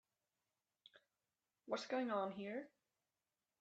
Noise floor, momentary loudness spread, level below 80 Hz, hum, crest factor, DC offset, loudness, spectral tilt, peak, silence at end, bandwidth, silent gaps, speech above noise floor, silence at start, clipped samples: under -90 dBFS; 17 LU; under -90 dBFS; none; 20 dB; under 0.1%; -44 LUFS; -5 dB/octave; -30 dBFS; 0.95 s; 8.2 kHz; none; over 46 dB; 1.65 s; under 0.1%